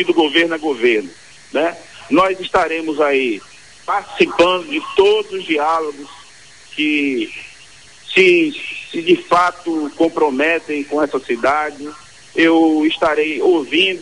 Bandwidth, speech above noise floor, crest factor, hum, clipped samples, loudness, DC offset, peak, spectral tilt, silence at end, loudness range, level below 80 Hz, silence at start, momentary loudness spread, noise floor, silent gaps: 11 kHz; 27 dB; 16 dB; none; under 0.1%; -16 LUFS; 0.4%; 0 dBFS; -4 dB/octave; 0 s; 3 LU; -54 dBFS; 0 s; 14 LU; -43 dBFS; none